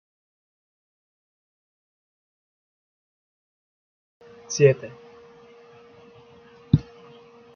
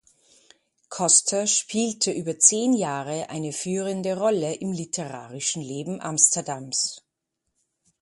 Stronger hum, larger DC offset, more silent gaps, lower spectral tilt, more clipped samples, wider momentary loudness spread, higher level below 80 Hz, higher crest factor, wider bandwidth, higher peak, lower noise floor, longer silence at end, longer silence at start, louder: neither; neither; neither; first, -7.5 dB/octave vs -3 dB/octave; neither; first, 22 LU vs 13 LU; first, -54 dBFS vs -70 dBFS; about the same, 28 dB vs 26 dB; second, 7 kHz vs 11.5 kHz; second, -4 dBFS vs 0 dBFS; second, -51 dBFS vs -80 dBFS; second, 0.75 s vs 1.05 s; first, 4.5 s vs 0.9 s; about the same, -22 LUFS vs -23 LUFS